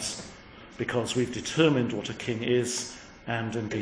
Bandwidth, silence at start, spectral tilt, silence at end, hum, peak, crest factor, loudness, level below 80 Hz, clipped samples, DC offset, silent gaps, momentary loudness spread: 10.5 kHz; 0 s; -4.5 dB/octave; 0 s; none; -6 dBFS; 22 dB; -28 LUFS; -58 dBFS; under 0.1%; under 0.1%; none; 17 LU